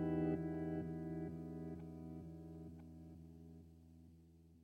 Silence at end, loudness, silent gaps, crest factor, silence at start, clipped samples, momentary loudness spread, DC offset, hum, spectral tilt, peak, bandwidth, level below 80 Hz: 0 s; -47 LUFS; none; 18 dB; 0 s; under 0.1%; 22 LU; under 0.1%; none; -10 dB/octave; -30 dBFS; 5 kHz; -64 dBFS